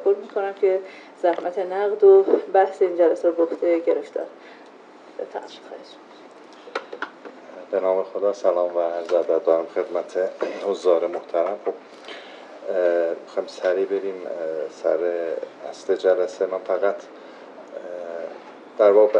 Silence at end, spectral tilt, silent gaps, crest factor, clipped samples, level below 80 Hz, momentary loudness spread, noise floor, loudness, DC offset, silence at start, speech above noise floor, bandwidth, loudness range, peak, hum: 0 s; -5 dB/octave; none; 18 dB; under 0.1%; under -90 dBFS; 20 LU; -46 dBFS; -22 LUFS; under 0.1%; 0 s; 24 dB; 8.4 kHz; 9 LU; -4 dBFS; none